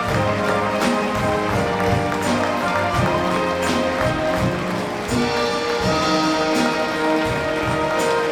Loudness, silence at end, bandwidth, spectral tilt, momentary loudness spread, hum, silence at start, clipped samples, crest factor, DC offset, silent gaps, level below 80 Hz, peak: -20 LUFS; 0 s; 18.5 kHz; -5 dB/octave; 3 LU; none; 0 s; under 0.1%; 14 dB; under 0.1%; none; -40 dBFS; -6 dBFS